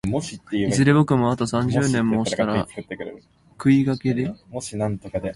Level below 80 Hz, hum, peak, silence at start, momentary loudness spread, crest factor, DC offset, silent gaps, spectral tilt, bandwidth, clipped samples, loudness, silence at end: -48 dBFS; none; -4 dBFS; 0.05 s; 14 LU; 18 dB; under 0.1%; none; -6.5 dB/octave; 11.5 kHz; under 0.1%; -22 LUFS; 0 s